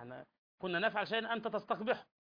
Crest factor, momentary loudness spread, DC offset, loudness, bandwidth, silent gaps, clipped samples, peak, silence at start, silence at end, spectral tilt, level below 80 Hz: 18 dB; 13 LU; under 0.1%; -37 LUFS; 5.2 kHz; 0.38-0.58 s; under 0.1%; -20 dBFS; 0 s; 0.2 s; -6.5 dB/octave; -80 dBFS